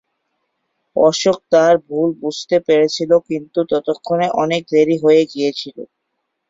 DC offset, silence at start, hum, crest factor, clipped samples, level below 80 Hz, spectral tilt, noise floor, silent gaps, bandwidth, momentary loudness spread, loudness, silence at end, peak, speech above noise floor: under 0.1%; 0.95 s; none; 14 dB; under 0.1%; -60 dBFS; -5 dB/octave; -73 dBFS; none; 7.8 kHz; 9 LU; -16 LUFS; 0.65 s; -2 dBFS; 58 dB